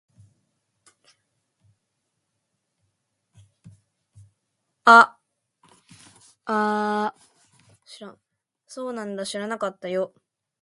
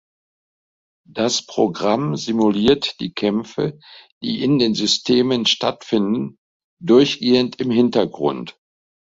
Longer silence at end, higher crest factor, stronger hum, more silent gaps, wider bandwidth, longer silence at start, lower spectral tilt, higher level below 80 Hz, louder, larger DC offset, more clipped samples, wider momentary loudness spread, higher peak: about the same, 0.55 s vs 0.65 s; first, 26 dB vs 18 dB; neither; second, none vs 4.12-4.21 s, 6.38-6.77 s; first, 11.5 kHz vs 7.8 kHz; first, 3.65 s vs 1.15 s; about the same, -4 dB/octave vs -5 dB/octave; second, -76 dBFS vs -56 dBFS; second, -21 LUFS vs -18 LUFS; neither; neither; first, 29 LU vs 10 LU; about the same, 0 dBFS vs -2 dBFS